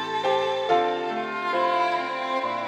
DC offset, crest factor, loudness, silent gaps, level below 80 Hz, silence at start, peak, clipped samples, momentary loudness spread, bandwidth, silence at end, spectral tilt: under 0.1%; 16 dB; -25 LUFS; none; -86 dBFS; 0 s; -8 dBFS; under 0.1%; 5 LU; 11.5 kHz; 0 s; -4 dB/octave